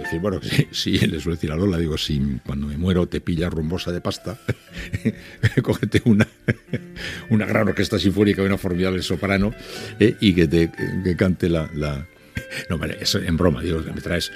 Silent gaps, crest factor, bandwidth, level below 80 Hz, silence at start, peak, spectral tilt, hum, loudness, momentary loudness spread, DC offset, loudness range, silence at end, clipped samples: none; 20 dB; 15.5 kHz; -40 dBFS; 0 s; 0 dBFS; -6 dB/octave; none; -22 LUFS; 11 LU; under 0.1%; 4 LU; 0 s; under 0.1%